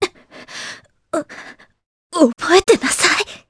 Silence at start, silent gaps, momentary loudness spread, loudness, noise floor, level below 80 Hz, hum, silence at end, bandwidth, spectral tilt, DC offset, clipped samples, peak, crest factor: 0 s; 1.86-2.10 s; 21 LU; -16 LUFS; -40 dBFS; -50 dBFS; none; 0.15 s; 11 kHz; -2 dB/octave; under 0.1%; under 0.1%; 0 dBFS; 18 dB